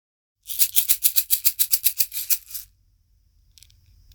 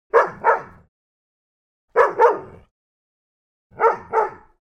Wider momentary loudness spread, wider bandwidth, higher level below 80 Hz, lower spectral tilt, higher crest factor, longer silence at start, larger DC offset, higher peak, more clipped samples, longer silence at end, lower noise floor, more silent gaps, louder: first, 12 LU vs 8 LU; first, over 20 kHz vs 8.4 kHz; about the same, -56 dBFS vs -60 dBFS; second, 3.5 dB/octave vs -5.5 dB/octave; about the same, 24 dB vs 20 dB; first, 0.45 s vs 0.15 s; neither; about the same, 0 dBFS vs -2 dBFS; neither; first, 1.5 s vs 0.3 s; second, -61 dBFS vs under -90 dBFS; second, none vs 0.88-1.88 s, 2.71-3.70 s; about the same, -18 LUFS vs -19 LUFS